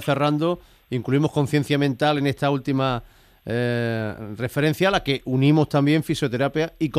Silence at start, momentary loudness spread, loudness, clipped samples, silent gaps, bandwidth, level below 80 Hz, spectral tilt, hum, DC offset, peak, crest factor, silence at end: 0 s; 10 LU; -22 LUFS; under 0.1%; none; 15.5 kHz; -50 dBFS; -6.5 dB/octave; none; under 0.1%; -6 dBFS; 16 dB; 0 s